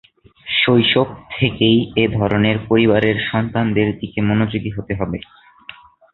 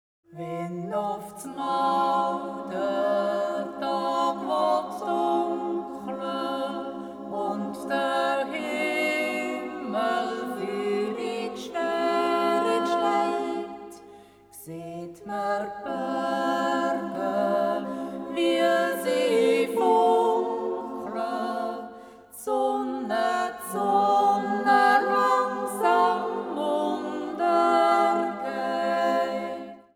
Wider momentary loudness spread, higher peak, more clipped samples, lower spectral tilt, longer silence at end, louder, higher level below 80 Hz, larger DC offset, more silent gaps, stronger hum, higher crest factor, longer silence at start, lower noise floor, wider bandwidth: about the same, 10 LU vs 12 LU; first, -2 dBFS vs -8 dBFS; neither; first, -9.5 dB/octave vs -4.5 dB/octave; first, 0.4 s vs 0.15 s; first, -17 LUFS vs -26 LUFS; first, -44 dBFS vs -70 dBFS; neither; neither; neither; about the same, 16 dB vs 18 dB; first, 0.45 s vs 0.3 s; second, -41 dBFS vs -50 dBFS; second, 4.3 kHz vs 18.5 kHz